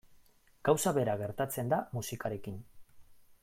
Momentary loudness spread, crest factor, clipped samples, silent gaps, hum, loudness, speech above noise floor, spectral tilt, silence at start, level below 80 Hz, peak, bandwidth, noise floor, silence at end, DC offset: 13 LU; 22 dB; under 0.1%; none; none; -33 LUFS; 30 dB; -5 dB/octave; 0.1 s; -64 dBFS; -12 dBFS; 16.5 kHz; -63 dBFS; 0.1 s; under 0.1%